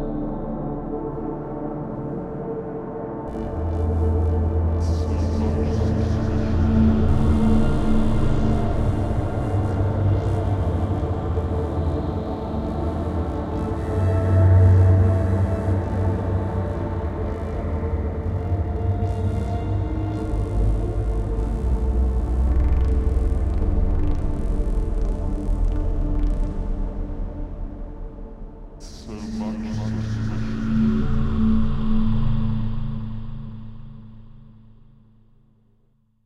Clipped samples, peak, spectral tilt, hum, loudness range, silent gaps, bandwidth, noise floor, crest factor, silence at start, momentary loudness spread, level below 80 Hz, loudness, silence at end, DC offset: under 0.1%; -6 dBFS; -9 dB/octave; none; 10 LU; none; 8.2 kHz; -61 dBFS; 14 dB; 0 s; 11 LU; -26 dBFS; -23 LUFS; 1.65 s; under 0.1%